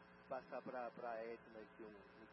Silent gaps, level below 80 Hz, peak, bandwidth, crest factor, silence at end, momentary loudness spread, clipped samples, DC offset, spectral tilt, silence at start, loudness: none; -84 dBFS; -36 dBFS; 5.6 kHz; 16 dB; 0 s; 10 LU; under 0.1%; under 0.1%; -4.5 dB/octave; 0 s; -52 LUFS